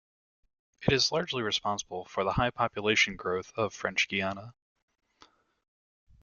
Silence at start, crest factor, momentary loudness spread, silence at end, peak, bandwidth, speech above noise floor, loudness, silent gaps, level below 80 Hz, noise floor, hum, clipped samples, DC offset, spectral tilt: 0.8 s; 24 dB; 9 LU; 1.7 s; -8 dBFS; 7.4 kHz; 33 dB; -29 LUFS; none; -54 dBFS; -63 dBFS; none; under 0.1%; under 0.1%; -3.5 dB/octave